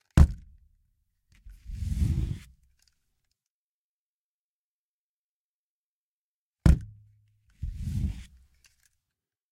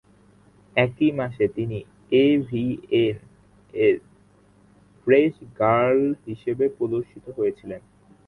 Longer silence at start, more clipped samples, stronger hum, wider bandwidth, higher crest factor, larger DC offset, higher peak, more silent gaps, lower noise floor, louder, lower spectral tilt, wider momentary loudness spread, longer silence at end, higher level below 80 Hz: second, 0.15 s vs 0.75 s; neither; second, none vs 50 Hz at -55 dBFS; first, 13 kHz vs 4.3 kHz; first, 28 dB vs 22 dB; neither; about the same, -4 dBFS vs -2 dBFS; first, 3.50-6.54 s vs none; first, under -90 dBFS vs -56 dBFS; second, -29 LUFS vs -23 LUFS; about the same, -7.5 dB/octave vs -8.5 dB/octave; first, 21 LU vs 15 LU; first, 1.3 s vs 0.5 s; first, -34 dBFS vs -58 dBFS